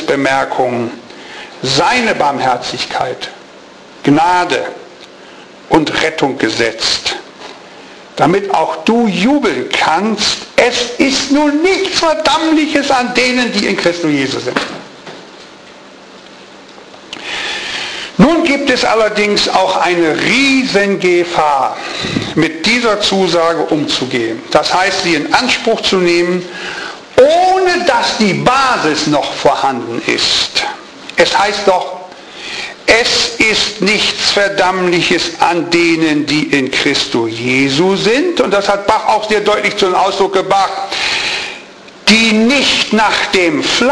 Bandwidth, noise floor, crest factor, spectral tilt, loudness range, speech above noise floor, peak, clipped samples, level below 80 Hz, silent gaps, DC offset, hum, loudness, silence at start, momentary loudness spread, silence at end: 11 kHz; -36 dBFS; 14 dB; -3.5 dB/octave; 5 LU; 24 dB; 0 dBFS; under 0.1%; -44 dBFS; none; under 0.1%; none; -12 LUFS; 0 s; 10 LU; 0 s